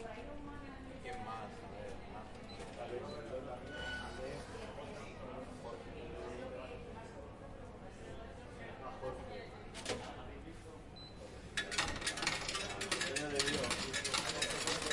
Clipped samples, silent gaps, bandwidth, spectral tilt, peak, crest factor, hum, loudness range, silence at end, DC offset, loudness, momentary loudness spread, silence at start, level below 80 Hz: under 0.1%; none; 11.5 kHz; -2.5 dB/octave; -16 dBFS; 26 dB; none; 12 LU; 0 s; under 0.1%; -42 LUFS; 15 LU; 0 s; -56 dBFS